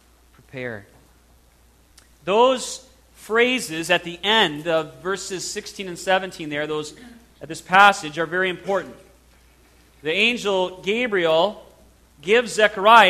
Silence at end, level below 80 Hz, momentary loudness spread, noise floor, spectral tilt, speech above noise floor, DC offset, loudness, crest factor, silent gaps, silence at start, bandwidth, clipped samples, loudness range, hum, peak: 0 s; -56 dBFS; 16 LU; -55 dBFS; -3 dB/octave; 35 dB; under 0.1%; -20 LUFS; 22 dB; none; 0.55 s; 14 kHz; under 0.1%; 3 LU; none; 0 dBFS